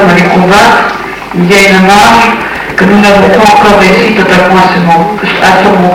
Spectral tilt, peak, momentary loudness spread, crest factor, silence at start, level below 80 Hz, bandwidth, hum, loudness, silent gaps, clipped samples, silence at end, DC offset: -5 dB/octave; 0 dBFS; 8 LU; 4 dB; 0 s; -30 dBFS; 17 kHz; none; -4 LUFS; none; 10%; 0 s; under 0.1%